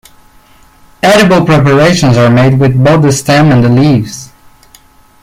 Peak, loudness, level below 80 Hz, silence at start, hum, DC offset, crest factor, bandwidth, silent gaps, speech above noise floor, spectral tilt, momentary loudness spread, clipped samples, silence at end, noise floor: 0 dBFS; -7 LUFS; -36 dBFS; 1.05 s; none; under 0.1%; 8 dB; 15.5 kHz; none; 35 dB; -6 dB/octave; 5 LU; under 0.1%; 0.95 s; -41 dBFS